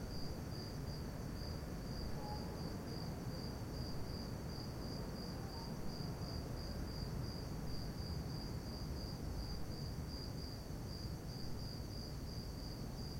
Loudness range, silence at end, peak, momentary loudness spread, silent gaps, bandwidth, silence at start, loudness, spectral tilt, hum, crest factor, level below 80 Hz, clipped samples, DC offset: 1 LU; 0 s; -30 dBFS; 2 LU; none; 16.5 kHz; 0 s; -46 LUFS; -6 dB/octave; none; 14 dB; -52 dBFS; under 0.1%; under 0.1%